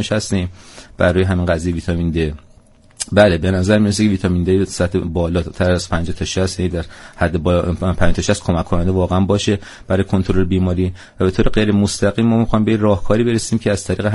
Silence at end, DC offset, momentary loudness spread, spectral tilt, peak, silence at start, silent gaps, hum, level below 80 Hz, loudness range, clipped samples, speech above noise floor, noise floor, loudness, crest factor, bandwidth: 0 s; under 0.1%; 7 LU; -6 dB/octave; 0 dBFS; 0 s; none; none; -30 dBFS; 3 LU; under 0.1%; 31 dB; -47 dBFS; -17 LUFS; 16 dB; 11.5 kHz